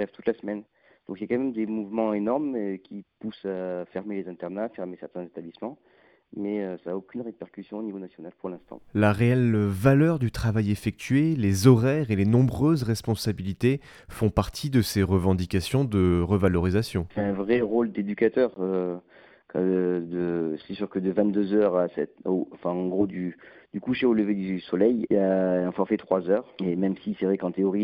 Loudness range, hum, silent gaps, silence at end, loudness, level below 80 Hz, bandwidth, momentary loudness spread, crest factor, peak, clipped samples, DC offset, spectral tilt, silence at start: 12 LU; none; none; 0 s; -26 LUFS; -50 dBFS; 16.5 kHz; 15 LU; 22 dB; -2 dBFS; under 0.1%; under 0.1%; -7.5 dB/octave; 0 s